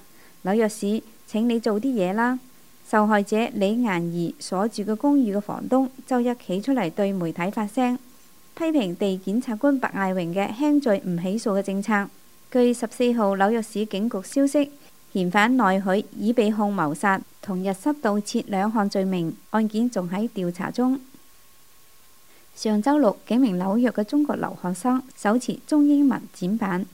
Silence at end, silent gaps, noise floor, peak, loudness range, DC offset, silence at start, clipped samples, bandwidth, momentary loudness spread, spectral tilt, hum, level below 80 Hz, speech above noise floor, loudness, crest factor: 0.05 s; none; -55 dBFS; -4 dBFS; 3 LU; 0.3%; 0.45 s; under 0.1%; 16 kHz; 7 LU; -6 dB/octave; none; -68 dBFS; 33 dB; -23 LUFS; 20 dB